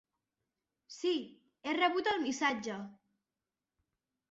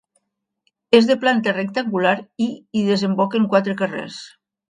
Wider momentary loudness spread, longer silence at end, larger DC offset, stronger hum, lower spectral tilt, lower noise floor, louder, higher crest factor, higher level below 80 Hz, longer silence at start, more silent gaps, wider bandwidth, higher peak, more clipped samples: first, 19 LU vs 10 LU; first, 1.35 s vs 0.4 s; neither; neither; second, -1 dB/octave vs -6 dB/octave; first, under -90 dBFS vs -75 dBFS; second, -34 LUFS vs -19 LUFS; about the same, 20 dB vs 20 dB; second, -78 dBFS vs -66 dBFS; about the same, 0.9 s vs 0.9 s; neither; second, 8 kHz vs 10.5 kHz; second, -18 dBFS vs 0 dBFS; neither